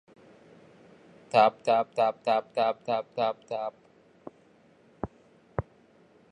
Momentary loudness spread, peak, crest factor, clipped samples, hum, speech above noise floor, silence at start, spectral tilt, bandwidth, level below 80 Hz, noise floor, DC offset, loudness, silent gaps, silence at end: 27 LU; -8 dBFS; 22 dB; under 0.1%; none; 34 dB; 1.35 s; -6 dB/octave; 10.5 kHz; -58 dBFS; -60 dBFS; under 0.1%; -28 LUFS; none; 0.7 s